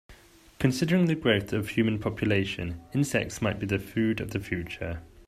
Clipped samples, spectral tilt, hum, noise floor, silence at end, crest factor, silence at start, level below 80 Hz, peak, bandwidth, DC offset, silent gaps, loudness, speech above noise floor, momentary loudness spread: under 0.1%; -6 dB/octave; none; -54 dBFS; 0.05 s; 20 dB; 0.1 s; -52 dBFS; -8 dBFS; 15 kHz; under 0.1%; none; -28 LUFS; 26 dB; 9 LU